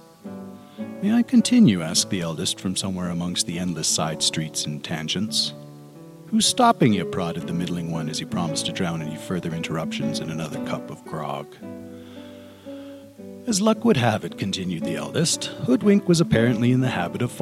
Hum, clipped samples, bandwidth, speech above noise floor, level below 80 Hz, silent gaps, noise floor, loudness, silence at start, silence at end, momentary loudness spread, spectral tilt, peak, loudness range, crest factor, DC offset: none; under 0.1%; 15 kHz; 20 dB; -58 dBFS; none; -43 dBFS; -22 LUFS; 0.25 s; 0 s; 21 LU; -4.5 dB/octave; -4 dBFS; 8 LU; 18 dB; under 0.1%